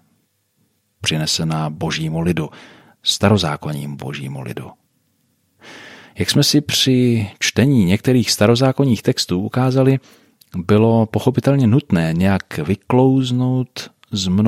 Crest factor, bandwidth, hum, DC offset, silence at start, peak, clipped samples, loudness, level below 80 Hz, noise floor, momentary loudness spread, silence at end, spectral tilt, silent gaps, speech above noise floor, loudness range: 16 dB; 15.5 kHz; none; under 0.1%; 1 s; -2 dBFS; under 0.1%; -17 LUFS; -50 dBFS; -64 dBFS; 14 LU; 0 s; -5.5 dB/octave; none; 48 dB; 7 LU